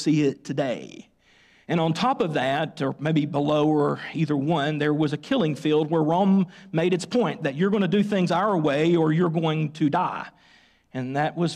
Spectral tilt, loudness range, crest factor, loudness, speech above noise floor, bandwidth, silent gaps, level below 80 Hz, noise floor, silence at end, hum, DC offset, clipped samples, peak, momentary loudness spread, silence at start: -7 dB/octave; 2 LU; 12 dB; -24 LUFS; 35 dB; 10.5 kHz; none; -66 dBFS; -58 dBFS; 0 s; none; under 0.1%; under 0.1%; -12 dBFS; 7 LU; 0 s